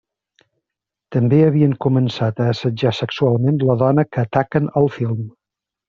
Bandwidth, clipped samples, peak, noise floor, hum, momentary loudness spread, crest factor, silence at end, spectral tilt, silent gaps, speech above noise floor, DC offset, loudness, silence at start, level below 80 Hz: 7 kHz; under 0.1%; -2 dBFS; -85 dBFS; none; 8 LU; 16 dB; 0.6 s; -7 dB/octave; none; 69 dB; under 0.1%; -18 LUFS; 1.1 s; -54 dBFS